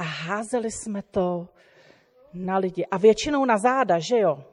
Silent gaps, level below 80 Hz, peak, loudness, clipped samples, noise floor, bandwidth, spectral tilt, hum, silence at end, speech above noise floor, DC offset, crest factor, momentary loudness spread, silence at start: none; -56 dBFS; -6 dBFS; -23 LUFS; under 0.1%; -56 dBFS; 11.5 kHz; -5 dB/octave; none; 0.1 s; 33 dB; under 0.1%; 18 dB; 12 LU; 0 s